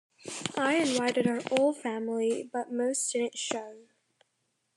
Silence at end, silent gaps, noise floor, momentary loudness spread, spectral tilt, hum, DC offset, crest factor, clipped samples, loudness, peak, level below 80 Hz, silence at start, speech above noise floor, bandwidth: 0.95 s; none; -78 dBFS; 9 LU; -3 dB/octave; none; under 0.1%; 22 dB; under 0.1%; -30 LUFS; -8 dBFS; -80 dBFS; 0.25 s; 49 dB; 12.5 kHz